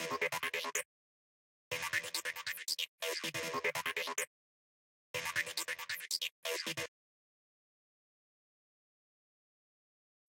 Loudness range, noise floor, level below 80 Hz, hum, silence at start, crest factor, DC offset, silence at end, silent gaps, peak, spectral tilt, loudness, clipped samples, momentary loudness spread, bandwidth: 6 LU; under -90 dBFS; -84 dBFS; none; 0 s; 22 dB; under 0.1%; 3.4 s; 0.85-1.71 s, 2.88-2.98 s, 4.27-5.14 s, 6.31-6.43 s; -20 dBFS; -0.5 dB/octave; -38 LUFS; under 0.1%; 5 LU; 17 kHz